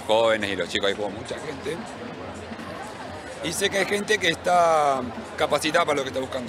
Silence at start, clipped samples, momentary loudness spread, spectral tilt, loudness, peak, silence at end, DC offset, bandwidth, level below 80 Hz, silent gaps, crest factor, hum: 0 s; under 0.1%; 15 LU; -3 dB/octave; -24 LUFS; -6 dBFS; 0 s; under 0.1%; 16 kHz; -58 dBFS; none; 18 dB; none